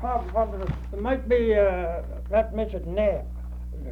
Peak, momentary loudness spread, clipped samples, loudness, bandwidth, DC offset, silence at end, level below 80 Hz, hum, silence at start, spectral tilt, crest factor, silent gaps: -10 dBFS; 14 LU; under 0.1%; -26 LUFS; 5 kHz; under 0.1%; 0 s; -34 dBFS; 60 Hz at -35 dBFS; 0 s; -8.5 dB/octave; 16 dB; none